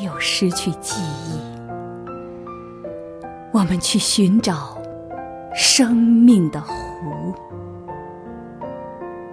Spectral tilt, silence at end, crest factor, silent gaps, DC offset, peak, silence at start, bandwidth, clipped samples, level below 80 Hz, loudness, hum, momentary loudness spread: -4 dB/octave; 0 s; 18 dB; none; under 0.1%; -2 dBFS; 0 s; 11 kHz; under 0.1%; -48 dBFS; -18 LUFS; none; 21 LU